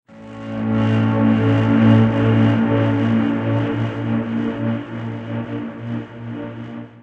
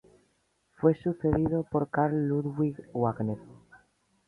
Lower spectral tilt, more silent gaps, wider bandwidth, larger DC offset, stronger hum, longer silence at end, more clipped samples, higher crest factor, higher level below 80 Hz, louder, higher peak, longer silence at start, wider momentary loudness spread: second, -9.5 dB/octave vs -11 dB/octave; neither; first, 5 kHz vs 4.1 kHz; neither; neither; second, 0 s vs 0.75 s; neither; about the same, 16 dB vs 20 dB; about the same, -48 dBFS vs -52 dBFS; first, -18 LUFS vs -29 LUFS; first, -2 dBFS vs -10 dBFS; second, 0.1 s vs 0.8 s; first, 16 LU vs 5 LU